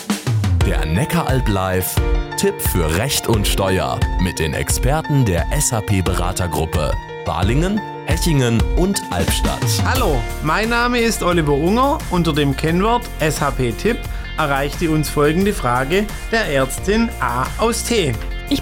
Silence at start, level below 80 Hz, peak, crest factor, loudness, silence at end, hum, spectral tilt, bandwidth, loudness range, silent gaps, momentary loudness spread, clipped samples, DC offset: 0 s; -26 dBFS; -6 dBFS; 12 dB; -18 LUFS; 0 s; none; -5 dB/octave; 17.5 kHz; 2 LU; none; 4 LU; under 0.1%; under 0.1%